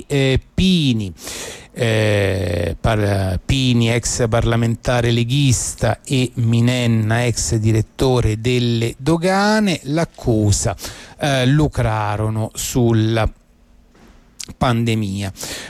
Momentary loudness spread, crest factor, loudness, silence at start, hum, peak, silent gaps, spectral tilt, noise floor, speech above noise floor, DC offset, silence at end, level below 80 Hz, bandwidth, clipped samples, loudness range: 7 LU; 12 dB; -18 LUFS; 0 s; none; -6 dBFS; none; -5.5 dB/octave; -50 dBFS; 33 dB; under 0.1%; 0 s; -34 dBFS; 15 kHz; under 0.1%; 2 LU